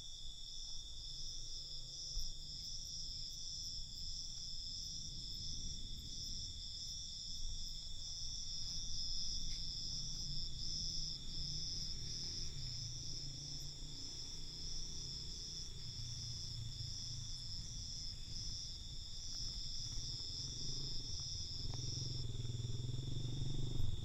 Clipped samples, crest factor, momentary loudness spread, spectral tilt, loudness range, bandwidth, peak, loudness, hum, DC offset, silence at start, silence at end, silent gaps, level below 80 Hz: under 0.1%; 18 dB; 5 LU; -2.5 dB/octave; 3 LU; 14 kHz; -26 dBFS; -45 LUFS; none; under 0.1%; 0 s; 0 s; none; -50 dBFS